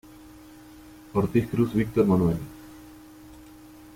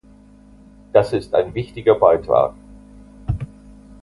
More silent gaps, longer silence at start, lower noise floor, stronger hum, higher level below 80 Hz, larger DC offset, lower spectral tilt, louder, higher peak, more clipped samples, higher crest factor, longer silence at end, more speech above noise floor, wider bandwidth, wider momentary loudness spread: neither; second, 0.3 s vs 0.95 s; about the same, -48 dBFS vs -47 dBFS; neither; second, -50 dBFS vs -40 dBFS; neither; about the same, -8.5 dB/octave vs -8 dB/octave; second, -25 LUFS vs -18 LUFS; second, -10 dBFS vs 0 dBFS; neither; about the same, 18 dB vs 20 dB; about the same, 0.65 s vs 0.6 s; second, 25 dB vs 30 dB; first, 16.5 kHz vs 11.5 kHz; first, 26 LU vs 13 LU